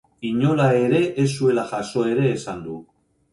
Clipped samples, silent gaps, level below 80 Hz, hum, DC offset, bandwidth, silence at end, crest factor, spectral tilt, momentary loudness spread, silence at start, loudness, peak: under 0.1%; none; -58 dBFS; none; under 0.1%; 11.5 kHz; 0.5 s; 16 dB; -7 dB/octave; 14 LU; 0.2 s; -21 LUFS; -6 dBFS